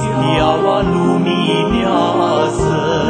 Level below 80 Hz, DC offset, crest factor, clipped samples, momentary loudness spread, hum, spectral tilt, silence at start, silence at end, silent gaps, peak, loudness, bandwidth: -34 dBFS; under 0.1%; 14 dB; under 0.1%; 2 LU; none; -6 dB/octave; 0 s; 0 s; none; 0 dBFS; -14 LUFS; 9.2 kHz